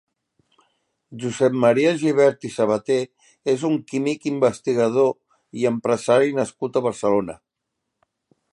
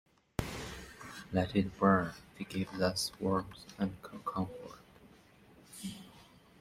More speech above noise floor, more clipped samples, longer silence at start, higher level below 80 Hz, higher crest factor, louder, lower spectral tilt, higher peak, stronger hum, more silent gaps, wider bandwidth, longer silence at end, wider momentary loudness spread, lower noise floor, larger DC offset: first, 60 dB vs 27 dB; neither; first, 1.1 s vs 0.4 s; second, -64 dBFS vs -58 dBFS; second, 18 dB vs 24 dB; first, -21 LUFS vs -35 LUFS; about the same, -6 dB/octave vs -5.5 dB/octave; first, -4 dBFS vs -12 dBFS; neither; neither; second, 11.5 kHz vs 16 kHz; first, 1.15 s vs 0.35 s; second, 11 LU vs 19 LU; first, -80 dBFS vs -61 dBFS; neither